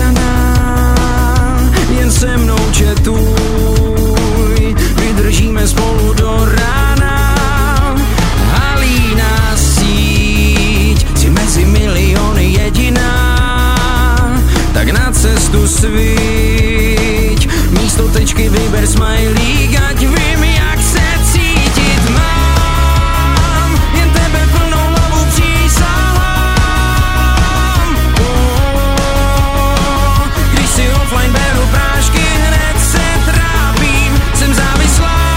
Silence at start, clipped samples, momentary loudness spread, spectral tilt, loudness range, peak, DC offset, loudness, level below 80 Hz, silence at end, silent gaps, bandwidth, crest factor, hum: 0 s; under 0.1%; 2 LU; -4.5 dB/octave; 1 LU; 0 dBFS; under 0.1%; -11 LUFS; -12 dBFS; 0 s; none; 16.5 kHz; 10 dB; none